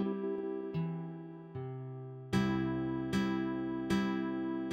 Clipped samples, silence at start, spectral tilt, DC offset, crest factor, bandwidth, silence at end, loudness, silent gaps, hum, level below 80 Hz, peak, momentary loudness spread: under 0.1%; 0 s; -7 dB/octave; under 0.1%; 16 dB; 14.5 kHz; 0 s; -36 LUFS; none; none; -60 dBFS; -18 dBFS; 12 LU